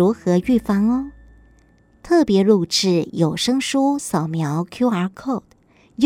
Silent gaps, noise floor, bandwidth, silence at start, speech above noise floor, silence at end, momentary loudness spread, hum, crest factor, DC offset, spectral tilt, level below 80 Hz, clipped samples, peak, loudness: none; -54 dBFS; 16 kHz; 0 s; 36 dB; 0 s; 9 LU; none; 16 dB; under 0.1%; -5.5 dB/octave; -50 dBFS; under 0.1%; -2 dBFS; -19 LUFS